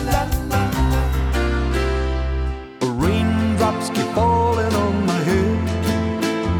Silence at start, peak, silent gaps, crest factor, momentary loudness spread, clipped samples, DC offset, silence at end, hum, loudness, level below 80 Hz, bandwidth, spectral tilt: 0 s; -4 dBFS; none; 14 dB; 5 LU; under 0.1%; under 0.1%; 0 s; none; -20 LUFS; -26 dBFS; over 20 kHz; -6 dB/octave